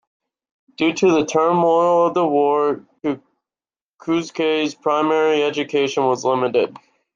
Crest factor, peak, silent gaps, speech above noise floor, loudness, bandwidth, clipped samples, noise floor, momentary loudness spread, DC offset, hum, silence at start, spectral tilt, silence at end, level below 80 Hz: 16 dB; -4 dBFS; 3.81-3.98 s; over 72 dB; -18 LUFS; 7.6 kHz; under 0.1%; under -90 dBFS; 10 LU; under 0.1%; none; 0.8 s; -5 dB/octave; 0.4 s; -66 dBFS